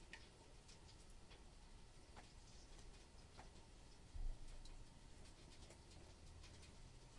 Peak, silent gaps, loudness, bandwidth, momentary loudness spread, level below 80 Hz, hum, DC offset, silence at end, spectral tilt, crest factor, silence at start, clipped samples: -38 dBFS; none; -63 LUFS; 11 kHz; 7 LU; -60 dBFS; none; under 0.1%; 0 s; -4 dB/octave; 20 dB; 0 s; under 0.1%